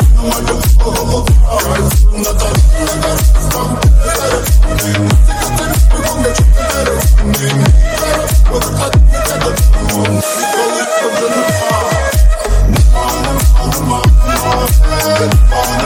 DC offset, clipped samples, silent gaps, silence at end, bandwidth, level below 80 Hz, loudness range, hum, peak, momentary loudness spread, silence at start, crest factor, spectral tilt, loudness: under 0.1%; under 0.1%; none; 0 s; 17 kHz; -10 dBFS; 1 LU; none; 0 dBFS; 3 LU; 0 s; 10 dB; -5 dB/octave; -12 LUFS